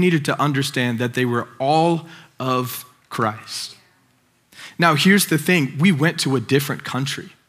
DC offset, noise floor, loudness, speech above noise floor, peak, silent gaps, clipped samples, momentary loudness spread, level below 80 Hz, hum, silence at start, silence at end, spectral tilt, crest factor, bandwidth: under 0.1%; -61 dBFS; -19 LUFS; 41 dB; 0 dBFS; none; under 0.1%; 13 LU; -72 dBFS; none; 0 s; 0.2 s; -5 dB/octave; 20 dB; 16 kHz